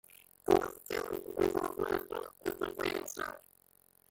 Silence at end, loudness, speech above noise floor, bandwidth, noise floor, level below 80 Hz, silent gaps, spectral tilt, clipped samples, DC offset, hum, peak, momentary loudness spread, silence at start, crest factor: 0.75 s; -35 LUFS; 31 dB; 17 kHz; -67 dBFS; -62 dBFS; none; -4.5 dB/octave; under 0.1%; under 0.1%; none; -14 dBFS; 12 LU; 0.45 s; 22 dB